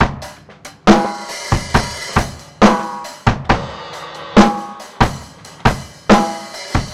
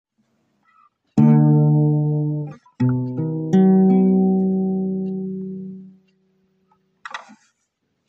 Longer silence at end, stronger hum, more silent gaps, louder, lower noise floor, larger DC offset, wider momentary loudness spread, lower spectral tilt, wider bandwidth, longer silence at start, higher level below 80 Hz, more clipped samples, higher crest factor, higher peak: second, 0 s vs 0.9 s; neither; neither; about the same, -16 LUFS vs -18 LUFS; second, -39 dBFS vs -72 dBFS; first, 0.1% vs under 0.1%; about the same, 18 LU vs 20 LU; second, -5.5 dB/octave vs -10.5 dB/octave; first, 14 kHz vs 4.1 kHz; second, 0 s vs 1.15 s; first, -30 dBFS vs -62 dBFS; neither; about the same, 16 dB vs 16 dB; first, 0 dBFS vs -4 dBFS